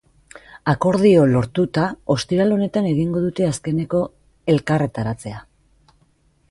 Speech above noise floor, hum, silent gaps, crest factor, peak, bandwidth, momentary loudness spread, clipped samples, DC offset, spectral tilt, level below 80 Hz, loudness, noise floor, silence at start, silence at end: 41 dB; none; none; 16 dB; -4 dBFS; 11.5 kHz; 12 LU; under 0.1%; under 0.1%; -7 dB/octave; -48 dBFS; -19 LUFS; -60 dBFS; 0.55 s; 1.1 s